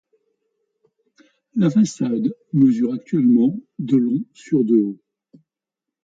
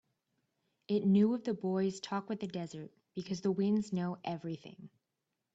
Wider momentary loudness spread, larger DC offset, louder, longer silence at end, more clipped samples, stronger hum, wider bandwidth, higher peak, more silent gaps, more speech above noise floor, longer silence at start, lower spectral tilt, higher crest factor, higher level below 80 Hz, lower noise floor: second, 10 LU vs 17 LU; neither; first, -19 LUFS vs -34 LUFS; first, 1.1 s vs 0.65 s; neither; neither; about the same, 7.8 kHz vs 8 kHz; first, -6 dBFS vs -18 dBFS; neither; first, 68 dB vs 53 dB; first, 1.55 s vs 0.9 s; about the same, -8 dB/octave vs -7 dB/octave; about the same, 14 dB vs 16 dB; first, -66 dBFS vs -76 dBFS; about the same, -86 dBFS vs -87 dBFS